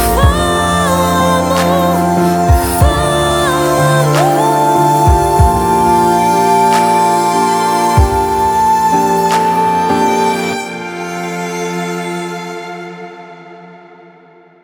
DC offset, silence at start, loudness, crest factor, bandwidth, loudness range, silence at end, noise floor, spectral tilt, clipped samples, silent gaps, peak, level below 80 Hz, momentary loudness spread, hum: under 0.1%; 0 s; -12 LUFS; 12 dB; over 20 kHz; 10 LU; 0.85 s; -42 dBFS; -5 dB/octave; under 0.1%; none; 0 dBFS; -24 dBFS; 11 LU; none